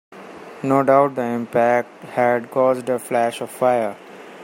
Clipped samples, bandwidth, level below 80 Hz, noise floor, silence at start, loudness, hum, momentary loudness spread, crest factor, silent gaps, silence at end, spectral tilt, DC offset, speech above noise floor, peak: under 0.1%; 16.5 kHz; -68 dBFS; -38 dBFS; 0.1 s; -19 LUFS; none; 22 LU; 18 dB; none; 0 s; -6 dB/octave; under 0.1%; 19 dB; -2 dBFS